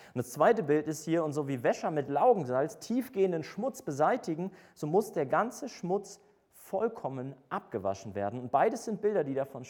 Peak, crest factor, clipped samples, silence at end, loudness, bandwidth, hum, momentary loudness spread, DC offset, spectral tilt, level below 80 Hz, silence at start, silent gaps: -12 dBFS; 20 dB; under 0.1%; 0 s; -31 LUFS; 19 kHz; none; 12 LU; under 0.1%; -6 dB/octave; -76 dBFS; 0 s; none